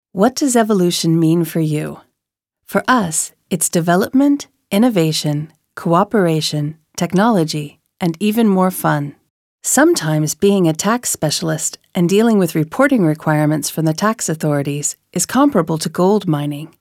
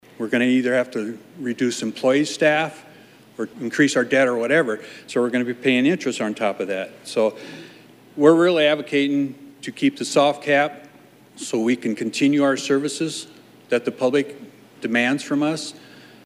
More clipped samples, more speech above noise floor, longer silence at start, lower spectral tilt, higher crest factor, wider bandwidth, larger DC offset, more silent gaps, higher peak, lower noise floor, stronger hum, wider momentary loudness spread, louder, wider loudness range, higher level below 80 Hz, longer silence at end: neither; first, 65 dB vs 29 dB; about the same, 0.15 s vs 0.2 s; about the same, -5 dB/octave vs -4.5 dB/octave; about the same, 16 dB vs 20 dB; first, 17 kHz vs 14.5 kHz; neither; first, 9.30-9.58 s vs none; about the same, 0 dBFS vs -2 dBFS; first, -81 dBFS vs -49 dBFS; neither; second, 8 LU vs 14 LU; first, -16 LUFS vs -21 LUFS; about the same, 2 LU vs 3 LU; first, -58 dBFS vs -76 dBFS; second, 0.15 s vs 0.45 s